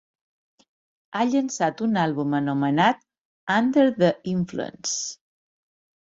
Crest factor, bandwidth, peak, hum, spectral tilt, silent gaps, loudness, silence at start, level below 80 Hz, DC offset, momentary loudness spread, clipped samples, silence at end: 20 dB; 8 kHz; -6 dBFS; none; -5 dB/octave; 3.21-3.47 s; -23 LUFS; 1.15 s; -64 dBFS; under 0.1%; 10 LU; under 0.1%; 1 s